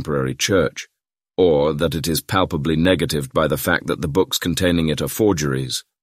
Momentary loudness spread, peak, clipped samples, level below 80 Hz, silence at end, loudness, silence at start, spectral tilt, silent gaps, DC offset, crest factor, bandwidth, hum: 6 LU; -2 dBFS; under 0.1%; -40 dBFS; 0.2 s; -19 LUFS; 0 s; -4.5 dB/octave; none; under 0.1%; 18 dB; 16 kHz; none